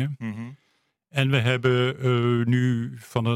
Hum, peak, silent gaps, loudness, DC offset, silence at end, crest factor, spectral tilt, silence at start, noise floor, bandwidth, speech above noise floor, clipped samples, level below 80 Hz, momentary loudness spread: none; -6 dBFS; none; -24 LUFS; under 0.1%; 0 s; 18 dB; -7 dB/octave; 0 s; -70 dBFS; 12 kHz; 47 dB; under 0.1%; -62 dBFS; 12 LU